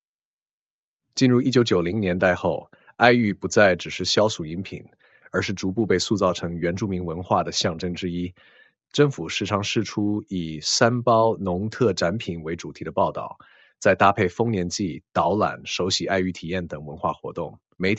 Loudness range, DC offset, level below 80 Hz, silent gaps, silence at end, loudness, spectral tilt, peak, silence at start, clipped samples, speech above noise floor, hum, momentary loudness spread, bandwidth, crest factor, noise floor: 5 LU; under 0.1%; -58 dBFS; none; 0 s; -23 LUFS; -5 dB/octave; 0 dBFS; 1.15 s; under 0.1%; over 67 dB; none; 13 LU; 8.2 kHz; 22 dB; under -90 dBFS